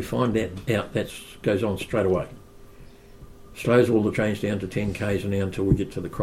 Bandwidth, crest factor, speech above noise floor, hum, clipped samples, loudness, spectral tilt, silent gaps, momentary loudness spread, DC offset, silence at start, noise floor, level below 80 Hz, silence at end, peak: 16 kHz; 20 dB; 22 dB; none; under 0.1%; -25 LUFS; -7 dB/octave; none; 9 LU; under 0.1%; 0 s; -46 dBFS; -44 dBFS; 0 s; -6 dBFS